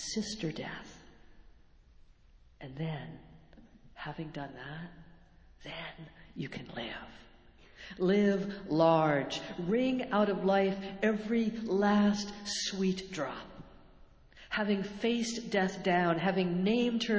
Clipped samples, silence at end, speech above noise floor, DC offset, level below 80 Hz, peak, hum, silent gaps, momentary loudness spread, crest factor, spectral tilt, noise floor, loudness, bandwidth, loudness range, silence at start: under 0.1%; 0 s; 29 dB; under 0.1%; -60 dBFS; -14 dBFS; none; none; 18 LU; 20 dB; -5.5 dB/octave; -60 dBFS; -32 LUFS; 8 kHz; 15 LU; 0 s